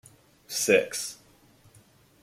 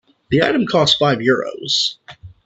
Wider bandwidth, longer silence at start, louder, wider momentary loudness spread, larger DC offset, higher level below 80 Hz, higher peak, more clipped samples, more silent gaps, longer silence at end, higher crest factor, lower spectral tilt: first, 16.5 kHz vs 8.6 kHz; first, 0.5 s vs 0.3 s; second, -26 LUFS vs -16 LUFS; first, 16 LU vs 6 LU; neither; second, -70 dBFS vs -52 dBFS; second, -6 dBFS vs 0 dBFS; neither; neither; first, 1.1 s vs 0.15 s; first, 24 dB vs 18 dB; second, -2 dB/octave vs -4.5 dB/octave